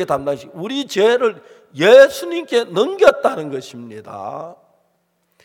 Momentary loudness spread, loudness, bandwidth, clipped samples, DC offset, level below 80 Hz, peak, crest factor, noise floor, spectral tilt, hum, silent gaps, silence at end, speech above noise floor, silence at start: 22 LU; -15 LUFS; 16.5 kHz; under 0.1%; under 0.1%; -60 dBFS; 0 dBFS; 16 dB; -65 dBFS; -4 dB/octave; none; none; 0.9 s; 49 dB; 0 s